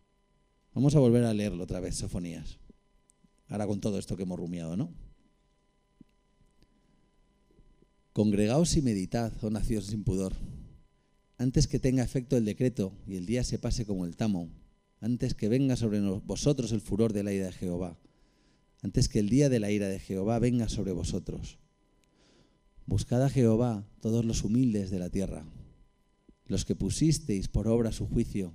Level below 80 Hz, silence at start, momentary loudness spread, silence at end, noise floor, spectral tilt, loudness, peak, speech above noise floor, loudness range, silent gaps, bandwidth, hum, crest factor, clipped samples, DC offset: -44 dBFS; 0.75 s; 12 LU; 0 s; -69 dBFS; -6.5 dB/octave; -30 LUFS; -12 dBFS; 41 dB; 7 LU; none; 15.5 kHz; none; 18 dB; under 0.1%; under 0.1%